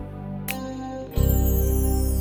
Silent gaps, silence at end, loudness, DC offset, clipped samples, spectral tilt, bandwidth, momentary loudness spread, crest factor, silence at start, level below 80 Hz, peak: none; 0 s; -25 LUFS; under 0.1%; under 0.1%; -6.5 dB/octave; over 20 kHz; 11 LU; 14 dB; 0 s; -26 dBFS; -8 dBFS